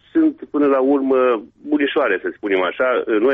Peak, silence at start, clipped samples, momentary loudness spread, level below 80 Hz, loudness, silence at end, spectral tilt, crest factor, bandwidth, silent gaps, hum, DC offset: -6 dBFS; 0.15 s; under 0.1%; 5 LU; -62 dBFS; -18 LUFS; 0 s; -2.5 dB/octave; 10 dB; 3.9 kHz; none; none; under 0.1%